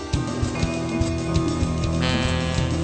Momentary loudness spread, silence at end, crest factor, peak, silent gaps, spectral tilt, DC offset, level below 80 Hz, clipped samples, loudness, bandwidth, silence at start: 3 LU; 0 s; 14 dB; -8 dBFS; none; -5.5 dB/octave; under 0.1%; -32 dBFS; under 0.1%; -24 LUFS; 9.2 kHz; 0 s